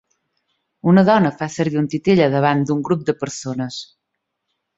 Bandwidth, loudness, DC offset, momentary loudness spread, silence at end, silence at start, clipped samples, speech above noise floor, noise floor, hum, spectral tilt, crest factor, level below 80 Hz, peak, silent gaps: 8 kHz; -18 LUFS; under 0.1%; 12 LU; 0.95 s; 0.85 s; under 0.1%; 60 dB; -77 dBFS; none; -6.5 dB/octave; 18 dB; -56 dBFS; 0 dBFS; none